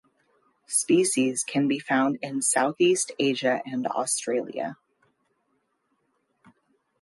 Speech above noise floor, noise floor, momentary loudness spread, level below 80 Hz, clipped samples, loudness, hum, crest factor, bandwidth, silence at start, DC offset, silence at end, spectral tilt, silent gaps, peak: 49 dB; -73 dBFS; 7 LU; -78 dBFS; under 0.1%; -25 LUFS; none; 18 dB; 12 kHz; 0.7 s; under 0.1%; 2.25 s; -3 dB/octave; none; -10 dBFS